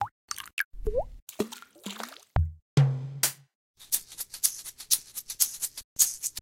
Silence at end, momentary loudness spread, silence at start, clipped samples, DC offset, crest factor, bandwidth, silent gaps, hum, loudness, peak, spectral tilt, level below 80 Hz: 0 s; 15 LU; 0 s; under 0.1%; under 0.1%; 26 dB; 17 kHz; 0.11-0.28 s, 0.53-0.57 s, 0.65-0.71 s, 1.22-1.27 s, 2.62-2.77 s, 3.55-3.74 s, 5.84-5.96 s; none; -29 LUFS; -6 dBFS; -3 dB/octave; -42 dBFS